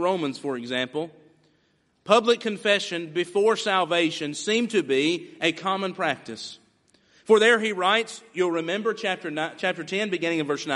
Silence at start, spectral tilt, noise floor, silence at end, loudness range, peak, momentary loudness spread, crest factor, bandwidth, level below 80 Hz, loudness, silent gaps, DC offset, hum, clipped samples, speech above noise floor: 0 s; -3.5 dB/octave; -67 dBFS; 0 s; 2 LU; -2 dBFS; 10 LU; 24 dB; 11.5 kHz; -74 dBFS; -24 LUFS; none; under 0.1%; none; under 0.1%; 43 dB